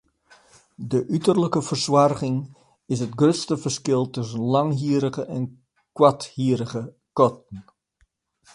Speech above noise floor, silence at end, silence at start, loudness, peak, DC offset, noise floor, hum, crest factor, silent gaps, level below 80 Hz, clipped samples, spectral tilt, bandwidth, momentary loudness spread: 45 dB; 0.95 s; 0.8 s; -23 LUFS; -2 dBFS; under 0.1%; -66 dBFS; none; 22 dB; none; -62 dBFS; under 0.1%; -6 dB/octave; 11.5 kHz; 14 LU